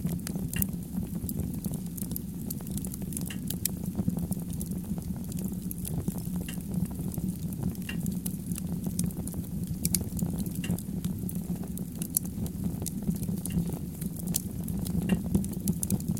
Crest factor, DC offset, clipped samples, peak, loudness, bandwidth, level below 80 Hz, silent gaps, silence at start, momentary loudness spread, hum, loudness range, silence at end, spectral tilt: 30 dB; 0.1%; under 0.1%; -4 dBFS; -33 LUFS; 17 kHz; -44 dBFS; none; 0 s; 6 LU; none; 2 LU; 0 s; -5.5 dB/octave